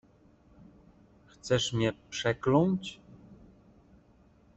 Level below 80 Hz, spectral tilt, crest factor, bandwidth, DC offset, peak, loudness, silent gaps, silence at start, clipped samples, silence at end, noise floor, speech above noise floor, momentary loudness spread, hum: -60 dBFS; -5.5 dB/octave; 22 dB; 8.2 kHz; under 0.1%; -10 dBFS; -29 LUFS; none; 1.45 s; under 0.1%; 1.25 s; -61 dBFS; 33 dB; 18 LU; none